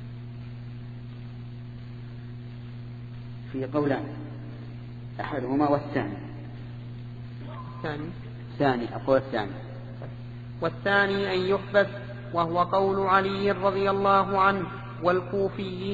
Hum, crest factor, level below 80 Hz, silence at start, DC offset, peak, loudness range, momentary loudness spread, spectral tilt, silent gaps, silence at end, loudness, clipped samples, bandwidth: none; 22 dB; -52 dBFS; 0 s; under 0.1%; -6 dBFS; 10 LU; 18 LU; -8 dB/octave; none; 0 s; -26 LUFS; under 0.1%; 7.6 kHz